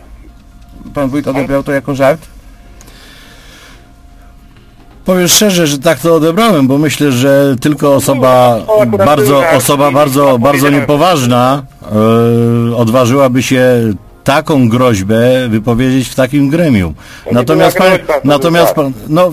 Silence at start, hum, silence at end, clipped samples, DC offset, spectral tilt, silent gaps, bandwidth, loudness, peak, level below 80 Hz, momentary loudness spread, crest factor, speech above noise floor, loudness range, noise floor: 0.1 s; none; 0 s; 0.8%; under 0.1%; -5 dB/octave; none; 16 kHz; -9 LUFS; 0 dBFS; -36 dBFS; 7 LU; 10 dB; 29 dB; 8 LU; -37 dBFS